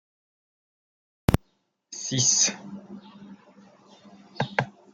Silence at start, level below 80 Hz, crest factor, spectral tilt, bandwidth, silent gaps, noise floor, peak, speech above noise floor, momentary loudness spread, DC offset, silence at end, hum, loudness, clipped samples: 1.3 s; -46 dBFS; 28 dB; -2.5 dB/octave; 16 kHz; none; -71 dBFS; -2 dBFS; 45 dB; 23 LU; under 0.1%; 0.25 s; none; -24 LUFS; under 0.1%